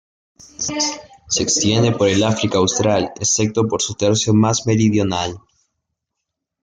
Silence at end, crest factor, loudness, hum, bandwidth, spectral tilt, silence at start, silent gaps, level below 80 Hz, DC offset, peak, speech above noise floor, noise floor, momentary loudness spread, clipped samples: 1.25 s; 16 dB; -17 LUFS; none; 9.8 kHz; -4 dB/octave; 0.6 s; none; -52 dBFS; under 0.1%; -2 dBFS; 62 dB; -79 dBFS; 7 LU; under 0.1%